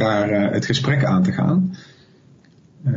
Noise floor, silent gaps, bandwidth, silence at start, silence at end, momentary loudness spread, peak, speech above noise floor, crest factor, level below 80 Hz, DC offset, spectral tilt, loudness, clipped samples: -51 dBFS; none; 7.6 kHz; 0 s; 0 s; 9 LU; -6 dBFS; 32 dB; 14 dB; -54 dBFS; under 0.1%; -6.5 dB/octave; -19 LUFS; under 0.1%